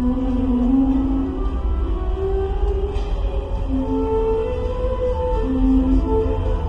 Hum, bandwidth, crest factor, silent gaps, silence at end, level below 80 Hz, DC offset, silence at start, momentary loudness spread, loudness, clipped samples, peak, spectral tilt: none; 5.4 kHz; 12 dB; none; 0 s; -22 dBFS; under 0.1%; 0 s; 7 LU; -21 LUFS; under 0.1%; -6 dBFS; -9.5 dB/octave